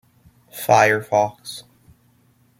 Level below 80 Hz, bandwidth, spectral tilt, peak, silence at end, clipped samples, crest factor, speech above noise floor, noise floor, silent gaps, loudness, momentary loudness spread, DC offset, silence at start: -64 dBFS; 16.5 kHz; -4 dB/octave; -2 dBFS; 1 s; under 0.1%; 20 dB; 40 dB; -58 dBFS; none; -18 LUFS; 21 LU; under 0.1%; 0.55 s